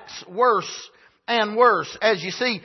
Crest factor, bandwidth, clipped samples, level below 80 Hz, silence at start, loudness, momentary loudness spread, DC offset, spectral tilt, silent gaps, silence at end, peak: 18 dB; 6.2 kHz; under 0.1%; -70 dBFS; 0 s; -20 LUFS; 16 LU; under 0.1%; -3.5 dB/octave; none; 0.05 s; -4 dBFS